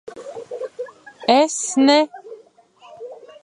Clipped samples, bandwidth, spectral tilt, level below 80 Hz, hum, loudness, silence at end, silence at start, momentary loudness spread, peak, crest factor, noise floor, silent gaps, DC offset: under 0.1%; 11 kHz; -2 dB/octave; -76 dBFS; none; -17 LUFS; 0.3 s; 0.05 s; 23 LU; -2 dBFS; 20 dB; -50 dBFS; none; under 0.1%